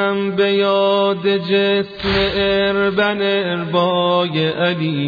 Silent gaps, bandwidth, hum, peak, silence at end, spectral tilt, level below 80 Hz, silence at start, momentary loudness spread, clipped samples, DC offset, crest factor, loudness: none; 5 kHz; none; -4 dBFS; 0 s; -7.5 dB/octave; -42 dBFS; 0 s; 3 LU; under 0.1%; under 0.1%; 14 dB; -16 LUFS